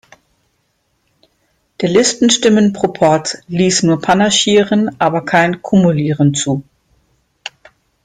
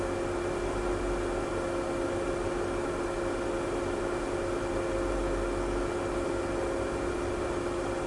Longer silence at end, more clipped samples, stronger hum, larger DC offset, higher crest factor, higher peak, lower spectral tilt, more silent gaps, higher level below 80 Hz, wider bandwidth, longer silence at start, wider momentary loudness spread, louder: first, 0.55 s vs 0 s; neither; neither; neither; about the same, 14 dB vs 12 dB; first, 0 dBFS vs -18 dBFS; about the same, -4.5 dB/octave vs -5.5 dB/octave; neither; second, -52 dBFS vs -42 dBFS; second, 9.6 kHz vs 11.5 kHz; first, 1.8 s vs 0 s; first, 10 LU vs 1 LU; first, -13 LUFS vs -32 LUFS